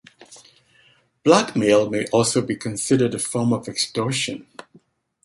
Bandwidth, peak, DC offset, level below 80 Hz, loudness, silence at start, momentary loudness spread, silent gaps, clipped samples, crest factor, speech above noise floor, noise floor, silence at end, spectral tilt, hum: 12 kHz; -2 dBFS; under 0.1%; -60 dBFS; -20 LUFS; 0.2 s; 8 LU; none; under 0.1%; 20 dB; 38 dB; -58 dBFS; 0.8 s; -4.5 dB/octave; none